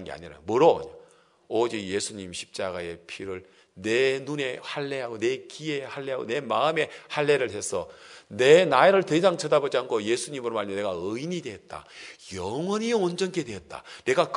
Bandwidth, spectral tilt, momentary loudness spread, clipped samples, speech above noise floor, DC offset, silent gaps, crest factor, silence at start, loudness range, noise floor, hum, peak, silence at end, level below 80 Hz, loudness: 11 kHz; -4.5 dB/octave; 18 LU; under 0.1%; 31 dB; under 0.1%; none; 24 dB; 0 s; 8 LU; -57 dBFS; none; -4 dBFS; 0 s; -68 dBFS; -26 LUFS